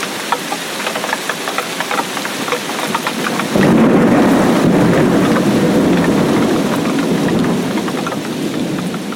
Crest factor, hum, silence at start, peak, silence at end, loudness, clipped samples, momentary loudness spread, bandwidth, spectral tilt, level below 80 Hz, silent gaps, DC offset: 12 dB; none; 0 s; -2 dBFS; 0 s; -15 LUFS; under 0.1%; 9 LU; 17 kHz; -5 dB/octave; -44 dBFS; none; under 0.1%